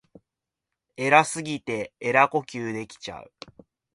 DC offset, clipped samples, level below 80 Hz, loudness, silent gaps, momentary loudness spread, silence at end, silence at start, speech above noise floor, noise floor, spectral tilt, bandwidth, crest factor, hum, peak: under 0.1%; under 0.1%; -66 dBFS; -24 LUFS; none; 19 LU; 0.7 s; 1 s; 62 dB; -87 dBFS; -4 dB/octave; 11.5 kHz; 26 dB; none; -2 dBFS